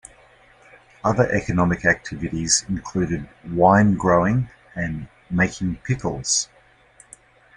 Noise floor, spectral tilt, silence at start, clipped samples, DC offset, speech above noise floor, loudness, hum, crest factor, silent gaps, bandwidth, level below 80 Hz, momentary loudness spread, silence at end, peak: -53 dBFS; -4.5 dB/octave; 1.05 s; under 0.1%; under 0.1%; 32 dB; -21 LUFS; none; 20 dB; none; 11.5 kHz; -46 dBFS; 12 LU; 1.1 s; -2 dBFS